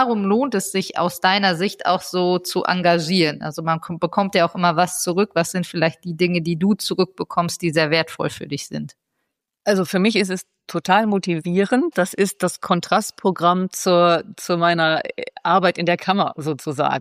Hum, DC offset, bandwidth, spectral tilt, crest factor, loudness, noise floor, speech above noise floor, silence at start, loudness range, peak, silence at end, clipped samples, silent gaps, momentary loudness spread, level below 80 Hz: none; under 0.1%; 15.5 kHz; -4.5 dB/octave; 16 dB; -20 LUFS; -77 dBFS; 57 dB; 0 s; 3 LU; -4 dBFS; 0 s; under 0.1%; none; 8 LU; -66 dBFS